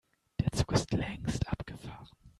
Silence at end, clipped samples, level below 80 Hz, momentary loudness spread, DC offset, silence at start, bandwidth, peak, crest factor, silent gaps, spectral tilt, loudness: 0.1 s; under 0.1%; -46 dBFS; 16 LU; under 0.1%; 0.4 s; 13 kHz; -14 dBFS; 20 dB; none; -5.5 dB/octave; -34 LUFS